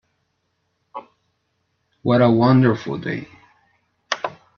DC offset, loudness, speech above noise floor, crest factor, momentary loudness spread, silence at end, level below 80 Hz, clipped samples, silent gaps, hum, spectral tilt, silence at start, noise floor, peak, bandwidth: under 0.1%; -19 LUFS; 55 dB; 20 dB; 24 LU; 0.3 s; -60 dBFS; under 0.1%; none; none; -7.5 dB/octave; 0.95 s; -71 dBFS; -2 dBFS; 6.8 kHz